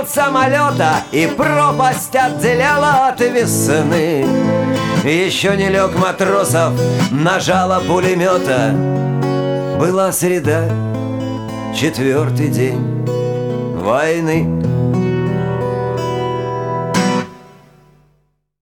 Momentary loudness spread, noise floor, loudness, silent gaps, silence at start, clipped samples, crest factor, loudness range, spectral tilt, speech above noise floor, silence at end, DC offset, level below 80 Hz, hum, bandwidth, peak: 6 LU; -61 dBFS; -15 LUFS; none; 0 s; under 0.1%; 12 dB; 4 LU; -5.5 dB/octave; 47 dB; 1.15 s; under 0.1%; -44 dBFS; none; 19 kHz; -2 dBFS